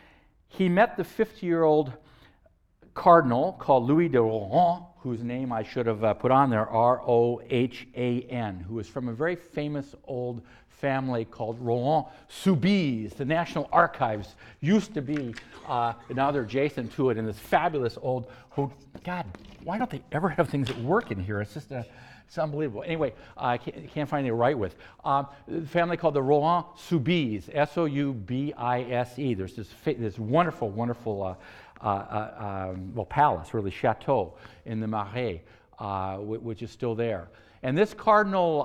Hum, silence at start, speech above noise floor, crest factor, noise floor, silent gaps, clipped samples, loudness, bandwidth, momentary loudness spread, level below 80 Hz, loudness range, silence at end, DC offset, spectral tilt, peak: none; 0.55 s; 36 dB; 24 dB; -63 dBFS; none; under 0.1%; -27 LUFS; 15.5 kHz; 13 LU; -58 dBFS; 7 LU; 0 s; under 0.1%; -7.5 dB/octave; -4 dBFS